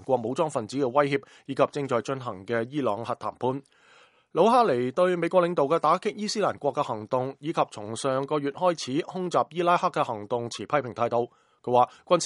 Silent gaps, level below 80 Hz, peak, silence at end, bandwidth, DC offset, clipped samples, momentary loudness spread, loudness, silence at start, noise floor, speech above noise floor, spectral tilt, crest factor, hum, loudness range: none; -72 dBFS; -6 dBFS; 0 s; 11.5 kHz; under 0.1%; under 0.1%; 8 LU; -26 LUFS; 0 s; -58 dBFS; 32 dB; -5.5 dB/octave; 20 dB; none; 4 LU